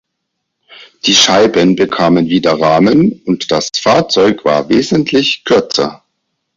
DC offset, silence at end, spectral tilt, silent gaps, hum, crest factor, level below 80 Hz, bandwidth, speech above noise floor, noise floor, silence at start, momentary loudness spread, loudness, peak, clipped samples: under 0.1%; 0.6 s; -4 dB/octave; none; none; 12 dB; -48 dBFS; 7.8 kHz; 61 dB; -72 dBFS; 0.8 s; 6 LU; -11 LUFS; 0 dBFS; under 0.1%